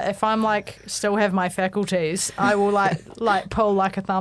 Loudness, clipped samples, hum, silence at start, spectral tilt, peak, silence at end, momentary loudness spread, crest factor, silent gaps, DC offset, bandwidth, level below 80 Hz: -22 LUFS; under 0.1%; none; 0 s; -4.5 dB/octave; -6 dBFS; 0 s; 4 LU; 16 dB; none; under 0.1%; 11 kHz; -50 dBFS